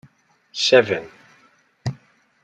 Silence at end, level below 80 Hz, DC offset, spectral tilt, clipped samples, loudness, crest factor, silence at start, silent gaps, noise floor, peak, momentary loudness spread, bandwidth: 0.5 s; -62 dBFS; under 0.1%; -4 dB/octave; under 0.1%; -20 LUFS; 22 dB; 0.55 s; none; -58 dBFS; -2 dBFS; 16 LU; 9.4 kHz